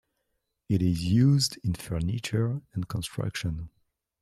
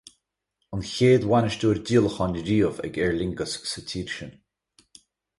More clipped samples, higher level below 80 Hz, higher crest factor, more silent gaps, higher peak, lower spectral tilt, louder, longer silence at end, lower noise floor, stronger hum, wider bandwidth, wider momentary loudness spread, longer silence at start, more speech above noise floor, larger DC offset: neither; about the same, -50 dBFS vs -48 dBFS; about the same, 16 dB vs 18 dB; neither; second, -12 dBFS vs -8 dBFS; about the same, -6 dB/octave vs -6 dB/octave; second, -28 LUFS vs -24 LUFS; second, 0.55 s vs 1.05 s; about the same, -79 dBFS vs -78 dBFS; neither; first, 14 kHz vs 11.5 kHz; about the same, 12 LU vs 14 LU; about the same, 0.7 s vs 0.7 s; about the same, 53 dB vs 54 dB; neither